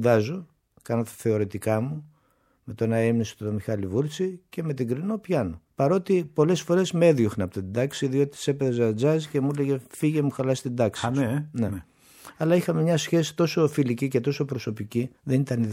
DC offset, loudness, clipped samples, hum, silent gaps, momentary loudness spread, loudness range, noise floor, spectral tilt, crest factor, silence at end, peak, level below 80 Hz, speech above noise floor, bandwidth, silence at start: under 0.1%; -25 LUFS; under 0.1%; none; none; 8 LU; 4 LU; -66 dBFS; -6.5 dB/octave; 18 dB; 0 s; -6 dBFS; -60 dBFS; 42 dB; 16.5 kHz; 0 s